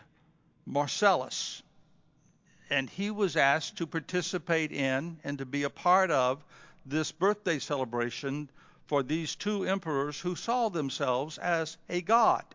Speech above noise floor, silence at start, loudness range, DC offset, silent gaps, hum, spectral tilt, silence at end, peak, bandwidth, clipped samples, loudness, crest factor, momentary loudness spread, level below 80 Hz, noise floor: 36 dB; 0.65 s; 3 LU; under 0.1%; none; none; -4 dB/octave; 0.1 s; -10 dBFS; 7.6 kHz; under 0.1%; -30 LUFS; 20 dB; 10 LU; -74 dBFS; -66 dBFS